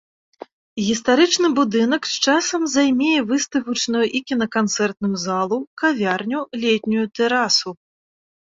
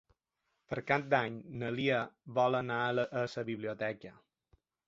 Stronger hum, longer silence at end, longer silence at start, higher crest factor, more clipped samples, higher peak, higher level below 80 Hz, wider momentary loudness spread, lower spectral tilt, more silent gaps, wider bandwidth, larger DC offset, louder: neither; about the same, 0.8 s vs 0.75 s; about the same, 0.75 s vs 0.7 s; second, 16 dB vs 22 dB; neither; first, -4 dBFS vs -14 dBFS; first, -62 dBFS vs -72 dBFS; second, 6 LU vs 10 LU; about the same, -3 dB/octave vs -4 dB/octave; first, 5.67-5.77 s vs none; about the same, 7.8 kHz vs 7.8 kHz; neither; first, -19 LUFS vs -34 LUFS